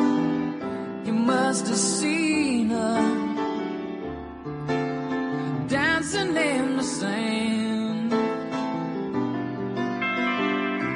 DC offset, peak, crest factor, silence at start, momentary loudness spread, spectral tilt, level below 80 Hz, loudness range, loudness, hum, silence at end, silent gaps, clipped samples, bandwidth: under 0.1%; -10 dBFS; 14 dB; 0 s; 8 LU; -4.5 dB/octave; -58 dBFS; 3 LU; -25 LUFS; none; 0 s; none; under 0.1%; 10.5 kHz